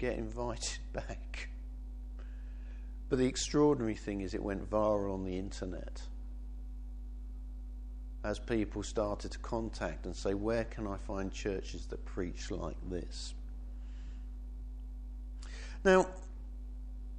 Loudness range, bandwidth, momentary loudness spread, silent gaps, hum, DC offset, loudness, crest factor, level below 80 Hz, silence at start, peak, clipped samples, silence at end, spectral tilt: 9 LU; 10 kHz; 16 LU; none; none; under 0.1%; -38 LUFS; 24 dB; -44 dBFS; 0 s; -14 dBFS; under 0.1%; 0 s; -5.5 dB/octave